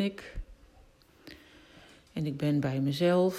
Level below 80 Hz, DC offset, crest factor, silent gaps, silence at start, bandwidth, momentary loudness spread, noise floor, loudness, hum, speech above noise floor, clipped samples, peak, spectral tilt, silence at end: -52 dBFS; under 0.1%; 18 dB; none; 0 s; 14.5 kHz; 25 LU; -59 dBFS; -30 LUFS; none; 31 dB; under 0.1%; -14 dBFS; -7 dB/octave; 0 s